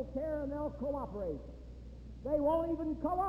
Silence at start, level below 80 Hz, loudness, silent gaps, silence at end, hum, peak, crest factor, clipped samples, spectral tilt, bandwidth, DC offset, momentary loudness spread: 0 s; -50 dBFS; -36 LUFS; none; 0 s; none; -22 dBFS; 14 dB; under 0.1%; -9.5 dB/octave; 13.5 kHz; under 0.1%; 19 LU